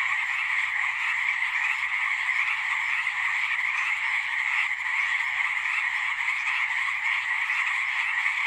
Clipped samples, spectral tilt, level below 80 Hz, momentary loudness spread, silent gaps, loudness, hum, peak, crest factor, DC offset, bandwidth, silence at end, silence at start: under 0.1%; 2.5 dB/octave; -70 dBFS; 1 LU; none; -24 LUFS; none; -12 dBFS; 14 dB; under 0.1%; 14.5 kHz; 0 s; 0 s